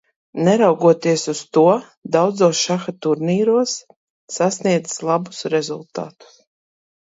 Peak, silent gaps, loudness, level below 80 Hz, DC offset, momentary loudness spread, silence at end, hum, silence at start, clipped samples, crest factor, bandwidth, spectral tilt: -2 dBFS; 1.97-2.02 s, 3.96-4.28 s; -18 LUFS; -68 dBFS; under 0.1%; 14 LU; 0.9 s; none; 0.35 s; under 0.1%; 18 dB; 8 kHz; -5 dB/octave